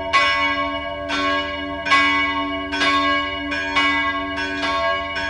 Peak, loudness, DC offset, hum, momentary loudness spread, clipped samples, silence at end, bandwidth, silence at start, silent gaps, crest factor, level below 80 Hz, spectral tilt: -2 dBFS; -19 LUFS; under 0.1%; none; 8 LU; under 0.1%; 0 s; 11 kHz; 0 s; none; 18 dB; -42 dBFS; -3 dB/octave